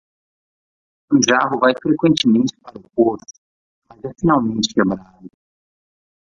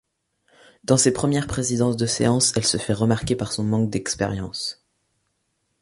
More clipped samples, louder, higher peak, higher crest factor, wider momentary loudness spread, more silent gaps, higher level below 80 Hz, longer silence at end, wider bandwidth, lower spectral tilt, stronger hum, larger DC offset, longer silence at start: neither; first, -17 LUFS vs -22 LUFS; about the same, -2 dBFS vs -4 dBFS; about the same, 18 dB vs 20 dB; first, 14 LU vs 9 LU; first, 3.38-3.82 s vs none; second, -54 dBFS vs -48 dBFS; second, 0.95 s vs 1.1 s; second, 9.6 kHz vs 11.5 kHz; about the same, -4.5 dB/octave vs -4.5 dB/octave; neither; neither; first, 1.1 s vs 0.9 s